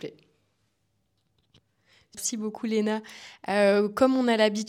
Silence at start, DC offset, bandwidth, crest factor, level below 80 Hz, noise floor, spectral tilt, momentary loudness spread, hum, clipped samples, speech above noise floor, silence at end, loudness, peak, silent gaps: 0.05 s; under 0.1%; 15.5 kHz; 20 dB; -70 dBFS; -74 dBFS; -4 dB/octave; 19 LU; none; under 0.1%; 49 dB; 0 s; -25 LUFS; -8 dBFS; none